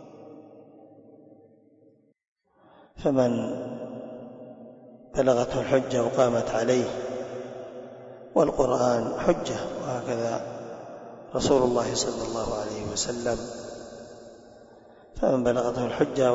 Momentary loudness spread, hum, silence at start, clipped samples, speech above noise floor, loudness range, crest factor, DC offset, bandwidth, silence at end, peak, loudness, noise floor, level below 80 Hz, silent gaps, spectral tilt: 21 LU; none; 0 s; under 0.1%; 35 dB; 6 LU; 20 dB; under 0.1%; 8 kHz; 0 s; -8 dBFS; -26 LUFS; -60 dBFS; -52 dBFS; 2.28-2.36 s; -5 dB/octave